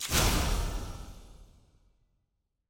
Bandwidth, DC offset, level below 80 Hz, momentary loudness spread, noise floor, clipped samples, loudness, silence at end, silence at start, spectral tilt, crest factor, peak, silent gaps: 17 kHz; under 0.1%; -36 dBFS; 21 LU; -80 dBFS; under 0.1%; -30 LUFS; 1.25 s; 0 s; -3 dB/octave; 20 dB; -12 dBFS; none